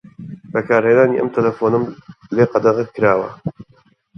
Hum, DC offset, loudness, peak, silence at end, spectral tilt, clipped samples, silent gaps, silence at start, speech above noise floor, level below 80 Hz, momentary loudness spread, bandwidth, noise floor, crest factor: none; under 0.1%; -17 LUFS; 0 dBFS; 0.55 s; -8.5 dB/octave; under 0.1%; none; 0.2 s; 39 dB; -56 dBFS; 15 LU; 6.2 kHz; -55 dBFS; 18 dB